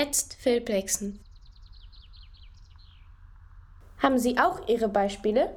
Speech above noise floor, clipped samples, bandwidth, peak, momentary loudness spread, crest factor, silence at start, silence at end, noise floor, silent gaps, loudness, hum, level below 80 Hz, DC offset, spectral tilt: 25 dB; under 0.1%; 18.5 kHz; -8 dBFS; 6 LU; 22 dB; 0 s; 0 s; -50 dBFS; none; -26 LUFS; none; -50 dBFS; under 0.1%; -3 dB/octave